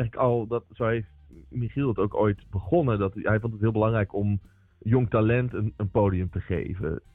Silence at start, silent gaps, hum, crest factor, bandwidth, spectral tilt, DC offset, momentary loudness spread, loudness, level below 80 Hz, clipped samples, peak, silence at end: 0 s; none; none; 14 dB; 3.9 kHz; -11.5 dB/octave; under 0.1%; 9 LU; -26 LUFS; -48 dBFS; under 0.1%; -12 dBFS; 0.15 s